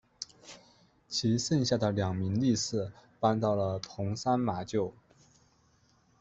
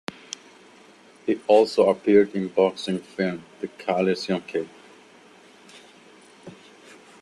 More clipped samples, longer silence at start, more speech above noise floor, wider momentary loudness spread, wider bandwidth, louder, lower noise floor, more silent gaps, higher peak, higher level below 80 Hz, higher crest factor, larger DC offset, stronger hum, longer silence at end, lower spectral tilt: neither; second, 0.2 s vs 1.25 s; first, 37 dB vs 29 dB; second, 14 LU vs 20 LU; second, 8.2 kHz vs 11.5 kHz; second, -31 LUFS vs -23 LUFS; first, -67 dBFS vs -51 dBFS; neither; second, -12 dBFS vs -4 dBFS; about the same, -64 dBFS vs -66 dBFS; about the same, 20 dB vs 20 dB; neither; neither; first, 1.3 s vs 0.7 s; about the same, -5.5 dB/octave vs -5.5 dB/octave